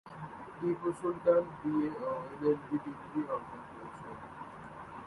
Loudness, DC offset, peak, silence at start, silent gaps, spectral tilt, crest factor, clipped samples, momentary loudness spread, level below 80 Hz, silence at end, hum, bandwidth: -34 LUFS; under 0.1%; -16 dBFS; 0.05 s; none; -8 dB/octave; 20 dB; under 0.1%; 17 LU; -68 dBFS; 0 s; none; 11.5 kHz